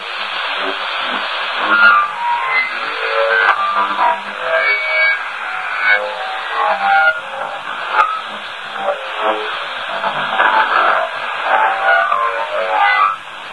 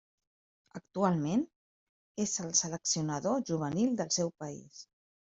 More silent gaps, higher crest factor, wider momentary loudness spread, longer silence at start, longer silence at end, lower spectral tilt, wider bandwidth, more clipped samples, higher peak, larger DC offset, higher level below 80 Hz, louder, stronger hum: second, none vs 1.56-2.15 s; about the same, 16 dB vs 20 dB; second, 9 LU vs 18 LU; second, 0 s vs 0.75 s; second, 0 s vs 0.55 s; second, -2 dB/octave vs -4 dB/octave; first, 11 kHz vs 8.2 kHz; neither; first, 0 dBFS vs -14 dBFS; first, 0.4% vs under 0.1%; first, -64 dBFS vs -72 dBFS; first, -15 LUFS vs -32 LUFS; neither